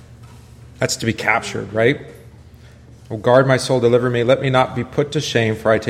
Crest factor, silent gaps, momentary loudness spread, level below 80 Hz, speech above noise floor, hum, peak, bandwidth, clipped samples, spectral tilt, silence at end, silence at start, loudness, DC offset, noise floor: 18 dB; none; 8 LU; -48 dBFS; 26 dB; none; 0 dBFS; 14.5 kHz; under 0.1%; -5 dB/octave; 0 s; 0.1 s; -17 LUFS; under 0.1%; -42 dBFS